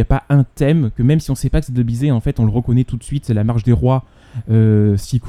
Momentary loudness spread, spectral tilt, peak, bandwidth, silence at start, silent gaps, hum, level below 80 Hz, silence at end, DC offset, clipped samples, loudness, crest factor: 6 LU; -8.5 dB/octave; 0 dBFS; 13.5 kHz; 0 s; none; none; -28 dBFS; 0 s; under 0.1%; under 0.1%; -16 LUFS; 14 dB